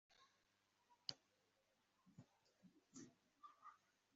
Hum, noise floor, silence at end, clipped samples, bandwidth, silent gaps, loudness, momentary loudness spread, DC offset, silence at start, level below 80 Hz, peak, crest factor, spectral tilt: none; -85 dBFS; 0 s; under 0.1%; 7.4 kHz; none; -59 LUFS; 14 LU; under 0.1%; 0.1 s; under -90 dBFS; -26 dBFS; 40 dB; -2 dB/octave